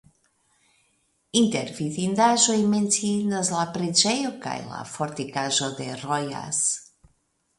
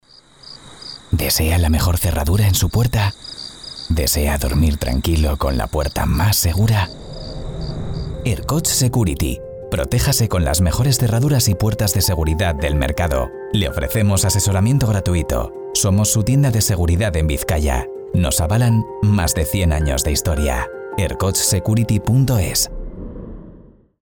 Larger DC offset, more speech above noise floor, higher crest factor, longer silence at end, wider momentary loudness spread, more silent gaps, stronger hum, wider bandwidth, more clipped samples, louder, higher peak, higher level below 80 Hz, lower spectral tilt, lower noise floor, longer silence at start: neither; first, 45 dB vs 28 dB; first, 22 dB vs 12 dB; first, 0.75 s vs 0.55 s; about the same, 12 LU vs 12 LU; neither; neither; second, 11.5 kHz vs over 20 kHz; neither; second, -24 LUFS vs -18 LUFS; first, -2 dBFS vs -6 dBFS; second, -66 dBFS vs -26 dBFS; second, -3 dB/octave vs -4.5 dB/octave; first, -69 dBFS vs -44 dBFS; first, 1.35 s vs 0.45 s